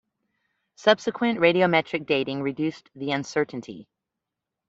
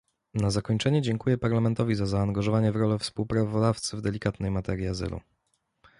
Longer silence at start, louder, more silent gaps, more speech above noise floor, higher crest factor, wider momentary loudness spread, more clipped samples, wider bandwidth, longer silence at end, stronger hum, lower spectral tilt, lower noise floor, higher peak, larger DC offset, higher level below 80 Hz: first, 0.8 s vs 0.35 s; first, -24 LUFS vs -27 LUFS; neither; first, 62 dB vs 49 dB; first, 22 dB vs 16 dB; first, 14 LU vs 6 LU; neither; second, 8 kHz vs 11.5 kHz; about the same, 0.85 s vs 0.8 s; neither; about the same, -5.5 dB/octave vs -6.5 dB/octave; first, -86 dBFS vs -75 dBFS; first, -4 dBFS vs -10 dBFS; neither; second, -68 dBFS vs -46 dBFS